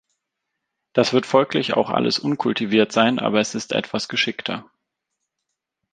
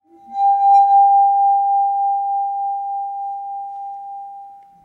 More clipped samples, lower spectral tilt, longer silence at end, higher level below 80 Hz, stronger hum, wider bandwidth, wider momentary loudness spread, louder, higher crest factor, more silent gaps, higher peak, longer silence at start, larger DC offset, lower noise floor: neither; first, -4.5 dB/octave vs -3 dB/octave; first, 1.3 s vs 0.3 s; first, -64 dBFS vs -80 dBFS; neither; first, 9.6 kHz vs 4.2 kHz; second, 7 LU vs 19 LU; second, -20 LUFS vs -16 LUFS; first, 20 dB vs 12 dB; neither; first, -2 dBFS vs -6 dBFS; first, 0.95 s vs 0.3 s; neither; first, -80 dBFS vs -39 dBFS